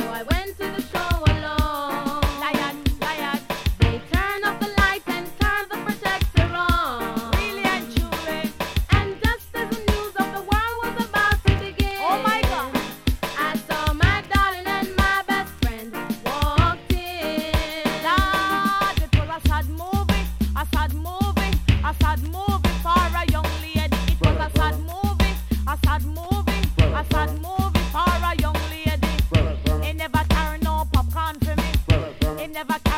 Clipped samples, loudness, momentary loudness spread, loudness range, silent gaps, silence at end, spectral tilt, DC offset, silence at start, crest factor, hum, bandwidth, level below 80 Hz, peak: under 0.1%; -23 LUFS; 6 LU; 2 LU; none; 0 s; -5.5 dB/octave; under 0.1%; 0 s; 18 dB; none; 17 kHz; -26 dBFS; -2 dBFS